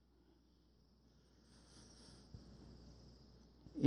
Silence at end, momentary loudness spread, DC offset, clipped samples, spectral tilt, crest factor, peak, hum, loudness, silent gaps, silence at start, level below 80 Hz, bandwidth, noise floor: 0 s; 6 LU; under 0.1%; under 0.1%; -7 dB/octave; 30 dB; -18 dBFS; none; -62 LUFS; none; 1.5 s; -68 dBFS; 10.5 kHz; -72 dBFS